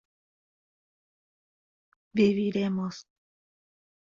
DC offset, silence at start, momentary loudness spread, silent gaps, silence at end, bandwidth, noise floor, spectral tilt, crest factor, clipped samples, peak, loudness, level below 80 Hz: under 0.1%; 2.15 s; 12 LU; none; 1.05 s; 7.4 kHz; under -90 dBFS; -7 dB/octave; 22 dB; under 0.1%; -10 dBFS; -27 LUFS; -70 dBFS